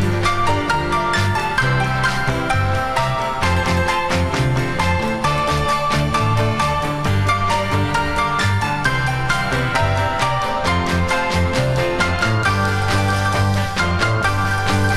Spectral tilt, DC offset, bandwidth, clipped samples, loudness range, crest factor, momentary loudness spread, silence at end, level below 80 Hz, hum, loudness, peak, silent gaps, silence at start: -5 dB/octave; under 0.1%; 14.5 kHz; under 0.1%; 1 LU; 14 dB; 2 LU; 0 s; -32 dBFS; none; -18 LUFS; -4 dBFS; none; 0 s